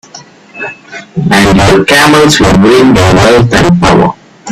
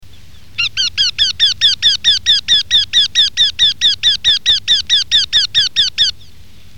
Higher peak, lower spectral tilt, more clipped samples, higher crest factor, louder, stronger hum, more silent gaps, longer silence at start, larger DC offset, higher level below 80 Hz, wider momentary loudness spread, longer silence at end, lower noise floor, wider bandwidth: about the same, 0 dBFS vs -2 dBFS; first, -5 dB/octave vs 1.5 dB/octave; first, 0.6% vs under 0.1%; second, 6 dB vs 12 dB; first, -5 LUFS vs -10 LUFS; neither; neither; first, 0.15 s vs 0 s; second, under 0.1% vs 3%; first, -26 dBFS vs -44 dBFS; first, 16 LU vs 5 LU; second, 0 s vs 0.65 s; second, -32 dBFS vs -42 dBFS; about the same, 16 kHz vs 17 kHz